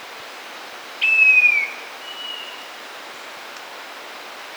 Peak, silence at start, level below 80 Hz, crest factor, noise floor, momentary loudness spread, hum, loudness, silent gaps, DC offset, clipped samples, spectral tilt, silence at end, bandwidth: -6 dBFS; 0 s; -84 dBFS; 18 dB; -36 dBFS; 23 LU; none; -15 LUFS; none; under 0.1%; under 0.1%; 1 dB/octave; 0 s; over 20 kHz